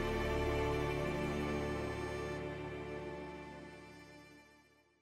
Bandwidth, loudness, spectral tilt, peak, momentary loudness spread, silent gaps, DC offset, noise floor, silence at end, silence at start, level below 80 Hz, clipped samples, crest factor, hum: 16 kHz; -39 LUFS; -6 dB/octave; -24 dBFS; 19 LU; none; under 0.1%; -67 dBFS; 0.45 s; 0 s; -50 dBFS; under 0.1%; 16 dB; none